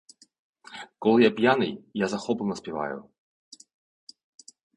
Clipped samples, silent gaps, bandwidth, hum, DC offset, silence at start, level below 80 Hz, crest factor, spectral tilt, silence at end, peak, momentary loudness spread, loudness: under 0.1%; none; 10.5 kHz; none; under 0.1%; 0.7 s; -66 dBFS; 22 dB; -5.5 dB/octave; 1.75 s; -6 dBFS; 21 LU; -25 LUFS